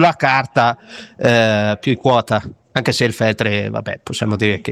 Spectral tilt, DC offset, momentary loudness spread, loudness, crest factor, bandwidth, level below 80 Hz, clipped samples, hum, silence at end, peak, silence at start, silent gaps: -5.5 dB/octave; under 0.1%; 10 LU; -17 LUFS; 16 dB; 14.5 kHz; -52 dBFS; under 0.1%; none; 0 s; 0 dBFS; 0 s; none